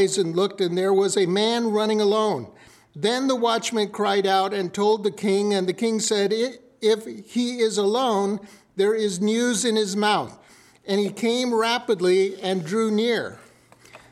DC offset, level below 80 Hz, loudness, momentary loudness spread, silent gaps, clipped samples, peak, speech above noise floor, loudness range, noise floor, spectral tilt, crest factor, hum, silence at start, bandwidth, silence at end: under 0.1%; -72 dBFS; -22 LUFS; 6 LU; none; under 0.1%; -8 dBFS; 30 dB; 1 LU; -52 dBFS; -4 dB/octave; 14 dB; none; 0 s; 14 kHz; 0.15 s